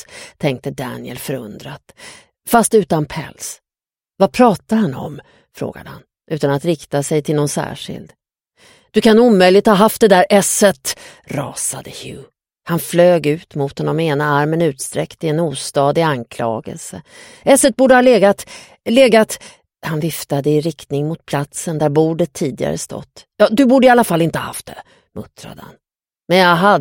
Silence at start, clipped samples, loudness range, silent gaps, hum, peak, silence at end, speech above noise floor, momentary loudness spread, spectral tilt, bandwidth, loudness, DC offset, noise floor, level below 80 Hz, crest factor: 0.1 s; under 0.1%; 7 LU; none; none; 0 dBFS; 0 s; over 75 dB; 20 LU; -5 dB/octave; 17 kHz; -15 LUFS; under 0.1%; under -90 dBFS; -52 dBFS; 16 dB